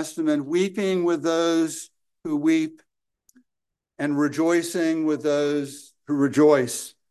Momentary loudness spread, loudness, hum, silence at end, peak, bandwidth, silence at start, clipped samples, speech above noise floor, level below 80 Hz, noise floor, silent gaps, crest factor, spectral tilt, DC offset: 13 LU; -23 LUFS; none; 0.2 s; -6 dBFS; 12.5 kHz; 0 s; under 0.1%; 61 dB; -74 dBFS; -84 dBFS; none; 18 dB; -5 dB/octave; under 0.1%